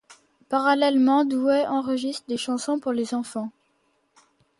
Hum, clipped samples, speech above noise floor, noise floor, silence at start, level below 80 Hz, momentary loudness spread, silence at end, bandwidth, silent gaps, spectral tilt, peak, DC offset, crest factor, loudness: none; under 0.1%; 46 dB; -68 dBFS; 0.1 s; -72 dBFS; 10 LU; 1.1 s; 11.5 kHz; none; -4 dB/octave; -8 dBFS; under 0.1%; 18 dB; -23 LUFS